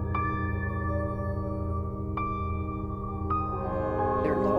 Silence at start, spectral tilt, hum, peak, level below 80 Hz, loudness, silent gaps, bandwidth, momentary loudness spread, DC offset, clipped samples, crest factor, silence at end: 0 s; -10 dB/octave; none; -14 dBFS; -40 dBFS; -31 LUFS; none; 5 kHz; 6 LU; under 0.1%; under 0.1%; 16 dB; 0 s